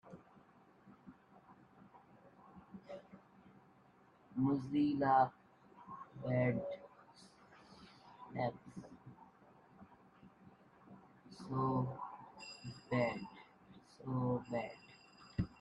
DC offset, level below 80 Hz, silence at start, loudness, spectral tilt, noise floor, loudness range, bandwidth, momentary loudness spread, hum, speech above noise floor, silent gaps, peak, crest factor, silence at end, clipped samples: under 0.1%; -68 dBFS; 0.05 s; -39 LUFS; -8 dB/octave; -67 dBFS; 22 LU; 11 kHz; 26 LU; none; 33 dB; none; -20 dBFS; 22 dB; 0.1 s; under 0.1%